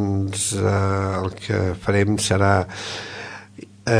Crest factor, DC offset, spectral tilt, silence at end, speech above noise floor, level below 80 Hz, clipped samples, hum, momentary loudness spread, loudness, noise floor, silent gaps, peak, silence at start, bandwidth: 20 dB; under 0.1%; -5 dB/octave; 0 s; 21 dB; -48 dBFS; under 0.1%; none; 14 LU; -21 LUFS; -42 dBFS; none; -2 dBFS; 0 s; 11 kHz